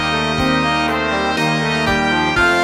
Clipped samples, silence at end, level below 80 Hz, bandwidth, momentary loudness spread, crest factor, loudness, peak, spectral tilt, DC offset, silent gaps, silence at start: under 0.1%; 0 s; -36 dBFS; 16 kHz; 3 LU; 14 dB; -16 LUFS; -4 dBFS; -4.5 dB/octave; under 0.1%; none; 0 s